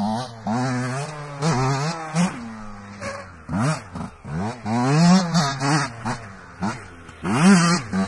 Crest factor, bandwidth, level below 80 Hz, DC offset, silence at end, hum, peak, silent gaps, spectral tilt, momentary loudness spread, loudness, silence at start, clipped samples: 18 dB; 11.5 kHz; -48 dBFS; under 0.1%; 0 s; none; -4 dBFS; none; -5.5 dB/octave; 19 LU; -22 LUFS; 0 s; under 0.1%